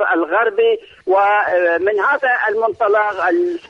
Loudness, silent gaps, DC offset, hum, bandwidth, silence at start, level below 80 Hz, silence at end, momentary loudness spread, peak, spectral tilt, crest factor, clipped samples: -16 LUFS; none; under 0.1%; none; 7 kHz; 0 s; -62 dBFS; 0.1 s; 3 LU; -4 dBFS; -5 dB/octave; 12 dB; under 0.1%